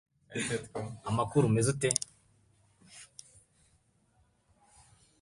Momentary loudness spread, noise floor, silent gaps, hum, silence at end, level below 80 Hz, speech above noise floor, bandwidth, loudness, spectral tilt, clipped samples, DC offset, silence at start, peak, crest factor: 24 LU; -70 dBFS; none; none; 2.15 s; -62 dBFS; 40 dB; 11.5 kHz; -31 LUFS; -5 dB/octave; under 0.1%; under 0.1%; 0.3 s; -6 dBFS; 28 dB